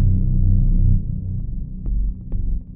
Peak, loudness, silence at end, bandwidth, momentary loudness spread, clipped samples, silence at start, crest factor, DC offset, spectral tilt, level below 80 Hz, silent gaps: -6 dBFS; -23 LUFS; 0 s; 0.8 kHz; 10 LU; under 0.1%; 0 s; 12 dB; under 0.1%; -16.5 dB/octave; -20 dBFS; none